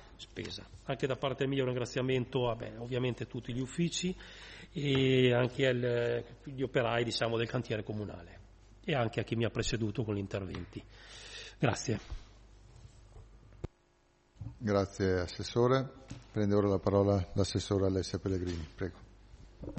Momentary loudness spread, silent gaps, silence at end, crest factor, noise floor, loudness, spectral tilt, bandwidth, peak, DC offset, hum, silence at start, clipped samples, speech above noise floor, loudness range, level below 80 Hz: 18 LU; none; 0 s; 20 dB; -69 dBFS; -33 LUFS; -6 dB/octave; 8.4 kHz; -14 dBFS; under 0.1%; none; 0 s; under 0.1%; 36 dB; 9 LU; -54 dBFS